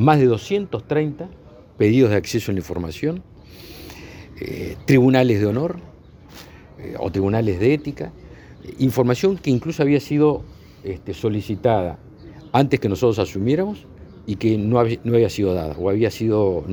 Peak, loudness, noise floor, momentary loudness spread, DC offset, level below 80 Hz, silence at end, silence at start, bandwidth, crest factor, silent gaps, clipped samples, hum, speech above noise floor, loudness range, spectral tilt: 0 dBFS; -20 LUFS; -43 dBFS; 19 LU; under 0.1%; -48 dBFS; 0 s; 0 s; over 20 kHz; 20 dB; none; under 0.1%; none; 24 dB; 3 LU; -7.5 dB/octave